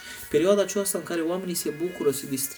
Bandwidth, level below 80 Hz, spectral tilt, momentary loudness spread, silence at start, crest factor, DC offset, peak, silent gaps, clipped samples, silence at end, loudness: over 20 kHz; -60 dBFS; -4 dB/octave; 6 LU; 0 s; 18 dB; under 0.1%; -8 dBFS; none; under 0.1%; 0 s; -26 LUFS